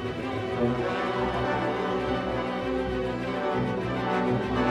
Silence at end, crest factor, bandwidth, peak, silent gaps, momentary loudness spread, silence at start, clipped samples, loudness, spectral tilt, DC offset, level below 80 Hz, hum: 0 s; 16 dB; 11.5 kHz; -12 dBFS; none; 3 LU; 0 s; under 0.1%; -28 LUFS; -7 dB/octave; under 0.1%; -44 dBFS; none